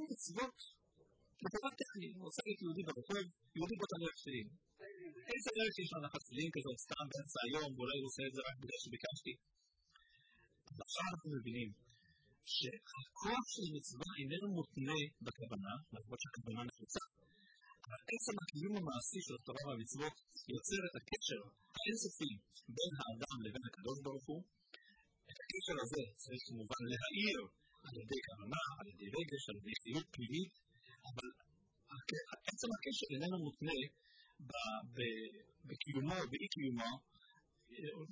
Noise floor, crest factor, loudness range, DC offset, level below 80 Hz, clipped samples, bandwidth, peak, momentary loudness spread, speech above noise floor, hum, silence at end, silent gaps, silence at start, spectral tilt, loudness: -74 dBFS; 20 dB; 4 LU; under 0.1%; -74 dBFS; under 0.1%; 8 kHz; -26 dBFS; 13 LU; 29 dB; none; 0 s; none; 0 s; -4 dB/octave; -45 LUFS